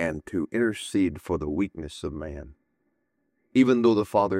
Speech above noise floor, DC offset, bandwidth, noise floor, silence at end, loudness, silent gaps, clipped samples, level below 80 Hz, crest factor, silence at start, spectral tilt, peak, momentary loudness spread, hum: 50 dB; under 0.1%; 14 kHz; -75 dBFS; 0 s; -25 LUFS; none; under 0.1%; -50 dBFS; 18 dB; 0 s; -6.5 dB/octave; -8 dBFS; 15 LU; none